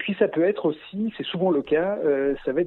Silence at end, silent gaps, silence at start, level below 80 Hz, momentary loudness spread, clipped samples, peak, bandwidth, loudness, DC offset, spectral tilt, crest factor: 0 s; none; 0 s; -56 dBFS; 7 LU; under 0.1%; -6 dBFS; 4.2 kHz; -24 LUFS; under 0.1%; -9.5 dB/octave; 16 dB